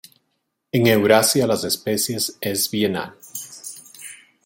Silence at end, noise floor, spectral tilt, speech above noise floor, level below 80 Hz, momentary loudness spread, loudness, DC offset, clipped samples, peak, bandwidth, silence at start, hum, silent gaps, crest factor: 0.3 s; -74 dBFS; -3.5 dB/octave; 54 dB; -62 dBFS; 21 LU; -19 LUFS; under 0.1%; under 0.1%; -2 dBFS; 17 kHz; 0.75 s; none; none; 20 dB